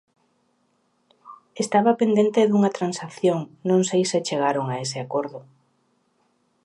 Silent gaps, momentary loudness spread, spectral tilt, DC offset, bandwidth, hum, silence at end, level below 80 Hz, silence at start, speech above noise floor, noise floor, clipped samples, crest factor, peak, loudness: none; 10 LU; -5.5 dB/octave; under 0.1%; 11 kHz; none; 1.25 s; -74 dBFS; 1.25 s; 46 dB; -68 dBFS; under 0.1%; 18 dB; -6 dBFS; -22 LUFS